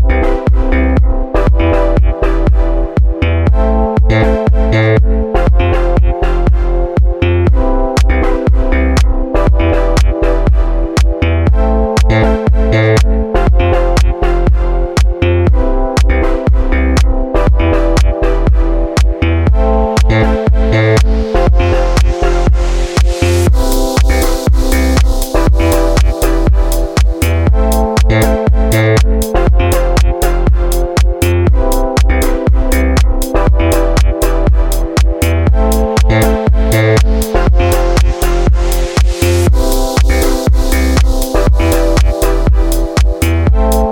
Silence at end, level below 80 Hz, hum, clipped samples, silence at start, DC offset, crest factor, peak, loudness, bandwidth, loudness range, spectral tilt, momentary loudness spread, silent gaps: 0 s; -12 dBFS; none; under 0.1%; 0 s; under 0.1%; 10 dB; 0 dBFS; -12 LUFS; 19 kHz; 1 LU; -6 dB/octave; 3 LU; none